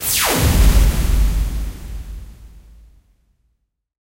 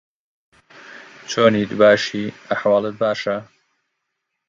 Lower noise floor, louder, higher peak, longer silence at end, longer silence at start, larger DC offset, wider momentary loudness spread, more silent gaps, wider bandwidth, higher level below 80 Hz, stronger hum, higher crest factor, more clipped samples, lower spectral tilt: second, -70 dBFS vs -77 dBFS; about the same, -17 LUFS vs -18 LUFS; about the same, -2 dBFS vs 0 dBFS; first, 1.55 s vs 1.05 s; second, 0 s vs 0.9 s; neither; about the same, 19 LU vs 18 LU; neither; first, 16 kHz vs 7.6 kHz; first, -20 dBFS vs -62 dBFS; neither; about the same, 16 dB vs 20 dB; neither; about the same, -4 dB/octave vs -5 dB/octave